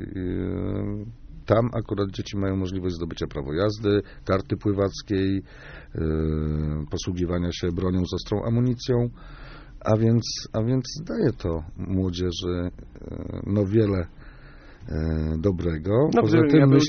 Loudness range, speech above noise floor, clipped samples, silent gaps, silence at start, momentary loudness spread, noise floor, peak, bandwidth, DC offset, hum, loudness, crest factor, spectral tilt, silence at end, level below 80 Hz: 2 LU; 21 dB; under 0.1%; none; 0 s; 13 LU; -45 dBFS; -4 dBFS; 6.6 kHz; under 0.1%; none; -25 LUFS; 20 dB; -7 dB/octave; 0 s; -40 dBFS